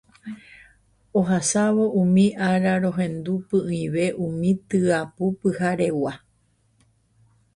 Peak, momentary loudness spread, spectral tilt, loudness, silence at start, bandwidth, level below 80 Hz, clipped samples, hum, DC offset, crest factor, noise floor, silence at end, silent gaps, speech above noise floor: -6 dBFS; 10 LU; -6 dB/octave; -22 LUFS; 0.25 s; 11.5 kHz; -58 dBFS; under 0.1%; none; under 0.1%; 16 dB; -64 dBFS; 1.4 s; none; 43 dB